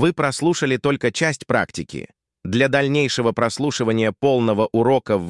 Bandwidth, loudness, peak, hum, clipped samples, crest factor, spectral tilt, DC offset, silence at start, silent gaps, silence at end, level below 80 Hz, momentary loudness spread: 12 kHz; -19 LUFS; -4 dBFS; none; under 0.1%; 14 dB; -5 dB/octave; under 0.1%; 0 s; none; 0 s; -56 dBFS; 8 LU